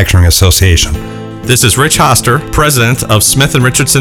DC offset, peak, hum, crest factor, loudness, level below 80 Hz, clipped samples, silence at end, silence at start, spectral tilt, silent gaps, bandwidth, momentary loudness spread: under 0.1%; 0 dBFS; none; 8 dB; -8 LUFS; -20 dBFS; 0.2%; 0 s; 0 s; -3.5 dB/octave; none; 18 kHz; 6 LU